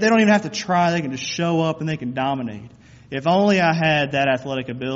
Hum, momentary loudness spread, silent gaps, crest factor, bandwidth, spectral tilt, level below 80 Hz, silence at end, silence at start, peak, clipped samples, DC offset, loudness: none; 11 LU; none; 16 dB; 7.8 kHz; -4.5 dB/octave; -58 dBFS; 0 s; 0 s; -4 dBFS; under 0.1%; under 0.1%; -20 LUFS